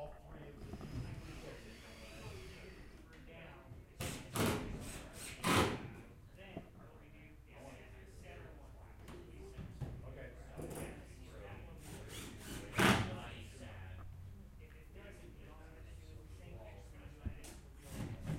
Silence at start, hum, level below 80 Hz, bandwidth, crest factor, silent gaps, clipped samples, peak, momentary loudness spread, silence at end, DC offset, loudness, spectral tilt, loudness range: 0 s; none; -56 dBFS; 16 kHz; 28 dB; none; under 0.1%; -18 dBFS; 20 LU; 0 s; under 0.1%; -43 LUFS; -4.5 dB/octave; 15 LU